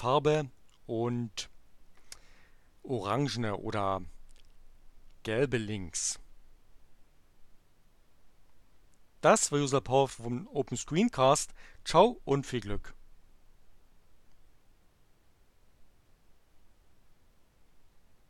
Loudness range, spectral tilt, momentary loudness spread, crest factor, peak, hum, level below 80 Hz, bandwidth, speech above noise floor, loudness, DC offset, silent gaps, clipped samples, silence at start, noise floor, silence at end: 11 LU; -4.5 dB/octave; 18 LU; 26 dB; -8 dBFS; none; -54 dBFS; 14 kHz; 33 dB; -30 LUFS; under 0.1%; none; under 0.1%; 0 s; -62 dBFS; 0.5 s